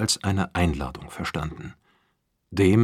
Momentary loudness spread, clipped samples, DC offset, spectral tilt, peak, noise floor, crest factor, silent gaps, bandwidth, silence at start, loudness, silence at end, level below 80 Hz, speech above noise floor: 13 LU; under 0.1%; under 0.1%; -5 dB/octave; -6 dBFS; -72 dBFS; 18 dB; none; 15 kHz; 0 s; -26 LUFS; 0 s; -42 dBFS; 48 dB